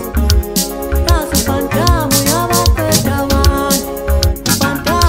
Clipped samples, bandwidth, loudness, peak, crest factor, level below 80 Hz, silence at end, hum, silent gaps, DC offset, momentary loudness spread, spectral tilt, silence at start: under 0.1%; 16.5 kHz; -13 LUFS; 0 dBFS; 12 dB; -18 dBFS; 0 s; none; none; under 0.1%; 4 LU; -4 dB/octave; 0 s